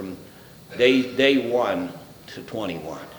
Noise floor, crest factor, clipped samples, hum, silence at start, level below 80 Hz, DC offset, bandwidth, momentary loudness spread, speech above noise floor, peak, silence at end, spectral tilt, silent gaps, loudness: -45 dBFS; 22 dB; under 0.1%; none; 0 s; -60 dBFS; under 0.1%; over 20 kHz; 21 LU; 23 dB; -2 dBFS; 0 s; -5 dB/octave; none; -21 LUFS